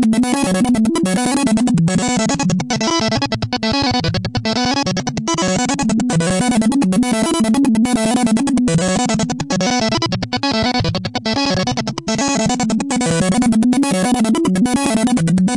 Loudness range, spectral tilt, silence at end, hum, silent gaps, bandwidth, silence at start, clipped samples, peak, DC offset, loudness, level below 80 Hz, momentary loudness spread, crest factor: 2 LU; -4.5 dB/octave; 0 s; none; none; 11.5 kHz; 0 s; under 0.1%; -4 dBFS; under 0.1%; -16 LUFS; -40 dBFS; 4 LU; 12 dB